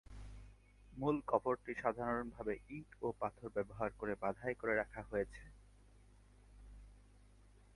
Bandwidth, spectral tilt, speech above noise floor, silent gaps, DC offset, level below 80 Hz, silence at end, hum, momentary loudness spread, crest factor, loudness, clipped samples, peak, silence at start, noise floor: 11.5 kHz; -8 dB/octave; 24 dB; none; under 0.1%; -60 dBFS; 0.35 s; 50 Hz at -60 dBFS; 22 LU; 24 dB; -41 LUFS; under 0.1%; -18 dBFS; 0.1 s; -64 dBFS